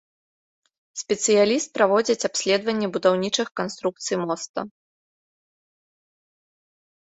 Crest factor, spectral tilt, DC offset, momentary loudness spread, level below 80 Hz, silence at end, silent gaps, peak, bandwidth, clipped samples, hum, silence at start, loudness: 22 dB; -3 dB/octave; under 0.1%; 13 LU; -70 dBFS; 2.5 s; 4.49-4.54 s; -4 dBFS; 8.4 kHz; under 0.1%; none; 0.95 s; -22 LUFS